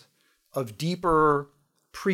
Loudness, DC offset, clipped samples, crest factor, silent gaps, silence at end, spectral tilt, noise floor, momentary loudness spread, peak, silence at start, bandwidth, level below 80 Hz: -26 LUFS; under 0.1%; under 0.1%; 16 dB; none; 0 s; -6.5 dB/octave; -67 dBFS; 20 LU; -12 dBFS; 0.55 s; 16 kHz; -50 dBFS